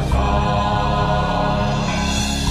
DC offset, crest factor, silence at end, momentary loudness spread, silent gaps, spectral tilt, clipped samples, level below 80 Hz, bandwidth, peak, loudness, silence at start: under 0.1%; 12 dB; 0 s; 1 LU; none; -5 dB/octave; under 0.1%; -24 dBFS; 14 kHz; -6 dBFS; -19 LUFS; 0 s